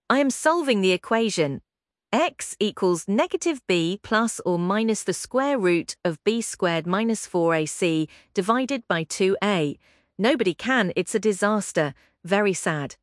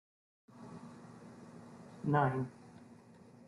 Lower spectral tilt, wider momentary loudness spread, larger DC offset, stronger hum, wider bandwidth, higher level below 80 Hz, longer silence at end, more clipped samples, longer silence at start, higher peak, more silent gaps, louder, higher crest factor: second, -4.5 dB/octave vs -8.5 dB/octave; second, 5 LU vs 26 LU; neither; neither; about the same, 12 kHz vs 11 kHz; first, -66 dBFS vs -74 dBFS; second, 0.1 s vs 0.55 s; neither; second, 0.1 s vs 0.55 s; first, -4 dBFS vs -18 dBFS; neither; first, -23 LUFS vs -35 LUFS; about the same, 18 dB vs 22 dB